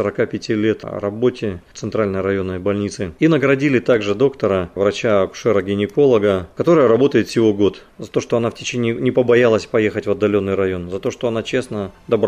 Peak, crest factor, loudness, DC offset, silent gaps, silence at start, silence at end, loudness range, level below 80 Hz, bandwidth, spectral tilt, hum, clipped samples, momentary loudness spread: -4 dBFS; 14 dB; -18 LUFS; under 0.1%; none; 0 s; 0 s; 3 LU; -52 dBFS; 11 kHz; -6.5 dB/octave; none; under 0.1%; 10 LU